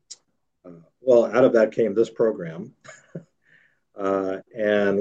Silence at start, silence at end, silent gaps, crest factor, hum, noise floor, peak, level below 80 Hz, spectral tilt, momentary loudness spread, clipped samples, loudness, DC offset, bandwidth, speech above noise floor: 0.1 s; 0 s; none; 18 dB; none; -67 dBFS; -4 dBFS; -74 dBFS; -6.5 dB/octave; 23 LU; under 0.1%; -21 LUFS; under 0.1%; 8.6 kHz; 45 dB